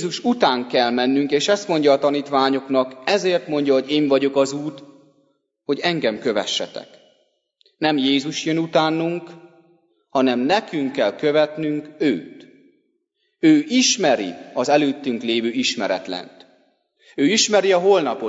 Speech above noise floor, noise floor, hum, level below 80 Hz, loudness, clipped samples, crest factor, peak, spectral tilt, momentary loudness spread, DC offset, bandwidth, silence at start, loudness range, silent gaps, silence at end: 52 dB; -71 dBFS; none; -72 dBFS; -19 LUFS; under 0.1%; 18 dB; -2 dBFS; -3.5 dB/octave; 9 LU; under 0.1%; 8 kHz; 0 s; 4 LU; none; 0 s